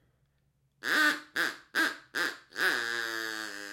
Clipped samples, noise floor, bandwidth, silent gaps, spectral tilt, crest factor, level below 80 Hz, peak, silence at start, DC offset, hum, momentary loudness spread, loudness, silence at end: under 0.1%; -73 dBFS; 17 kHz; none; -0.5 dB/octave; 18 dB; -80 dBFS; -14 dBFS; 0.85 s; under 0.1%; none; 9 LU; -30 LUFS; 0 s